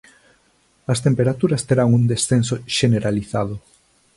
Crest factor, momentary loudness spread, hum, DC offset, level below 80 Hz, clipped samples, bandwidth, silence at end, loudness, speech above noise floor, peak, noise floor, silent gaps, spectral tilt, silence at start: 16 dB; 8 LU; none; under 0.1%; -48 dBFS; under 0.1%; 11.5 kHz; 0.6 s; -19 LUFS; 42 dB; -4 dBFS; -60 dBFS; none; -5.5 dB/octave; 0.9 s